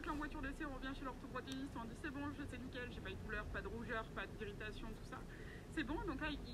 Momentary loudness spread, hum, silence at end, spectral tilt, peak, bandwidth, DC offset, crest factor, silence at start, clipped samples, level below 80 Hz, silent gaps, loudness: 7 LU; none; 0 s; -5.5 dB/octave; -30 dBFS; 15.5 kHz; under 0.1%; 18 dB; 0 s; under 0.1%; -54 dBFS; none; -47 LUFS